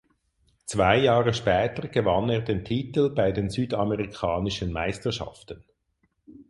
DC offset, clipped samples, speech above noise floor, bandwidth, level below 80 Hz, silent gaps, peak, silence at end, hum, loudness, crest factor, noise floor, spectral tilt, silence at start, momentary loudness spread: under 0.1%; under 0.1%; 47 dB; 11.5 kHz; -46 dBFS; none; -4 dBFS; 0.1 s; none; -25 LUFS; 22 dB; -72 dBFS; -6 dB/octave; 0.65 s; 12 LU